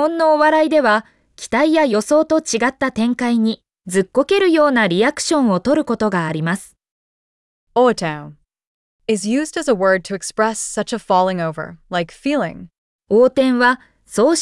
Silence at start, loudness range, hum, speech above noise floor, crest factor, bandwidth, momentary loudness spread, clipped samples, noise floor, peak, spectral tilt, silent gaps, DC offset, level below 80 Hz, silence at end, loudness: 0 s; 5 LU; none; over 74 dB; 14 dB; 12 kHz; 10 LU; under 0.1%; under -90 dBFS; -4 dBFS; -4.5 dB/octave; 6.91-7.67 s, 8.67-8.99 s, 12.78-12.99 s; under 0.1%; -54 dBFS; 0 s; -17 LUFS